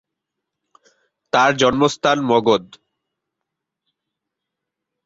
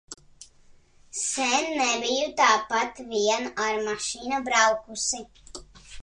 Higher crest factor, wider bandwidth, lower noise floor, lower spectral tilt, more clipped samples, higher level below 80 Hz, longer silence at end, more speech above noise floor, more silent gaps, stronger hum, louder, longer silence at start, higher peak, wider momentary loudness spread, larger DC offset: about the same, 20 dB vs 20 dB; second, 8 kHz vs 11.5 kHz; first, -82 dBFS vs -55 dBFS; first, -4.5 dB/octave vs -0.5 dB/octave; neither; about the same, -56 dBFS vs -58 dBFS; first, 2.4 s vs 0 s; first, 66 dB vs 30 dB; neither; neither; first, -17 LUFS vs -25 LUFS; first, 1.35 s vs 0.1 s; first, -2 dBFS vs -6 dBFS; second, 5 LU vs 22 LU; neither